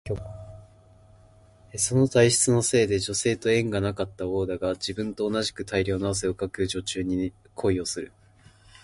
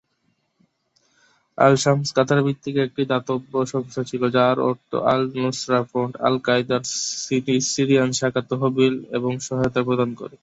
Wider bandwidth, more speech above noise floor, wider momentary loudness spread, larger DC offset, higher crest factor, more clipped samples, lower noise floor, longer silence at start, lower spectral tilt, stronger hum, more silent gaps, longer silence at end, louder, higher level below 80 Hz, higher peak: first, 11.5 kHz vs 8.2 kHz; second, 29 dB vs 48 dB; first, 14 LU vs 7 LU; neither; about the same, 22 dB vs 20 dB; neither; second, -55 dBFS vs -69 dBFS; second, 0.05 s vs 1.6 s; about the same, -4.5 dB/octave vs -5 dB/octave; neither; neither; first, 0.75 s vs 0.15 s; second, -25 LUFS vs -21 LUFS; first, -48 dBFS vs -60 dBFS; second, -6 dBFS vs -2 dBFS